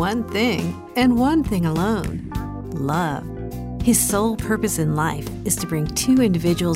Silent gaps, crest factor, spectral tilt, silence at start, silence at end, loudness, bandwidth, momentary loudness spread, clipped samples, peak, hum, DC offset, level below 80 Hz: none; 16 dB; -5 dB/octave; 0 s; 0 s; -21 LUFS; 16 kHz; 12 LU; under 0.1%; -4 dBFS; none; under 0.1%; -38 dBFS